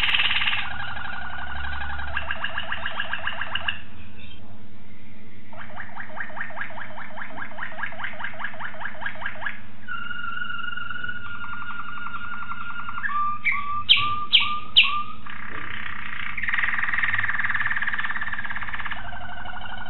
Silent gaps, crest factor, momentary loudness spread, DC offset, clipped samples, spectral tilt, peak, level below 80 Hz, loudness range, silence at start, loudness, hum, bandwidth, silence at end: none; 26 dB; 17 LU; 7%; under 0.1%; 1 dB/octave; -4 dBFS; -48 dBFS; 13 LU; 0 s; -26 LUFS; none; 4.5 kHz; 0 s